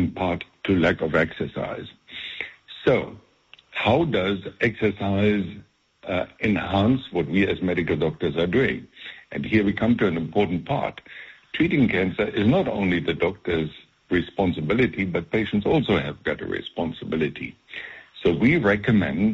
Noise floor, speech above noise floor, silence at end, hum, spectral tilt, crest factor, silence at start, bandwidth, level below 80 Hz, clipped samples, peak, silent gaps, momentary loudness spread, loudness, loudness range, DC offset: -44 dBFS; 22 dB; 0 s; none; -5 dB/octave; 16 dB; 0 s; 7.6 kHz; -48 dBFS; under 0.1%; -8 dBFS; none; 14 LU; -23 LUFS; 2 LU; under 0.1%